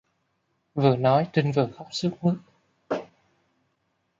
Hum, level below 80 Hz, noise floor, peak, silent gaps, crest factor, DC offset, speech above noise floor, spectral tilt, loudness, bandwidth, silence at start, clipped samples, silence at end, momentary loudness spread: none; -68 dBFS; -74 dBFS; -6 dBFS; none; 20 dB; under 0.1%; 50 dB; -7 dB/octave; -25 LUFS; 7.8 kHz; 0.75 s; under 0.1%; 1.15 s; 11 LU